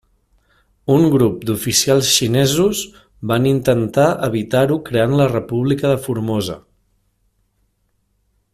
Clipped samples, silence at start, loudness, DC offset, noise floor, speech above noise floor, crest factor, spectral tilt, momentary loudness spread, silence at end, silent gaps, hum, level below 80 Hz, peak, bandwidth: under 0.1%; 0.85 s; -16 LUFS; under 0.1%; -65 dBFS; 49 dB; 16 dB; -5 dB/octave; 9 LU; 1.95 s; none; none; -48 dBFS; 0 dBFS; 16 kHz